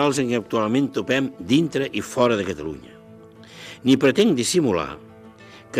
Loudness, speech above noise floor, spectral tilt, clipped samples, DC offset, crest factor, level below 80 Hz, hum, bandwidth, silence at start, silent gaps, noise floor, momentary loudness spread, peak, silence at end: -21 LUFS; 24 dB; -5 dB/octave; under 0.1%; under 0.1%; 16 dB; -58 dBFS; none; 15.5 kHz; 0 s; none; -45 dBFS; 16 LU; -6 dBFS; 0 s